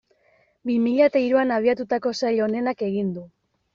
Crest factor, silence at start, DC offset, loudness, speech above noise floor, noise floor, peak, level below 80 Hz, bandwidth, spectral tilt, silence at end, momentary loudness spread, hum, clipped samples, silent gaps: 16 dB; 0.65 s; under 0.1%; -22 LUFS; 41 dB; -62 dBFS; -6 dBFS; -66 dBFS; 7.4 kHz; -5 dB/octave; 0.45 s; 9 LU; none; under 0.1%; none